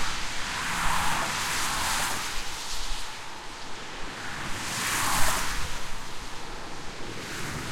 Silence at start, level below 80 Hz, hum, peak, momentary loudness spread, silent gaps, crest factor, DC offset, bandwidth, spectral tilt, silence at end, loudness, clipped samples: 0 s; -40 dBFS; none; -8 dBFS; 12 LU; none; 20 dB; under 0.1%; 16.5 kHz; -1.5 dB/octave; 0 s; -30 LUFS; under 0.1%